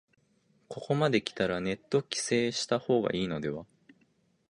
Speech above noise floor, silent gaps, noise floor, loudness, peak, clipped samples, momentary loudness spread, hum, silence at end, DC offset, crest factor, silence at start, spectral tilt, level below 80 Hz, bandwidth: 40 dB; none; -70 dBFS; -30 LUFS; -12 dBFS; under 0.1%; 10 LU; none; 0.85 s; under 0.1%; 20 dB; 0.7 s; -4.5 dB/octave; -64 dBFS; 11.5 kHz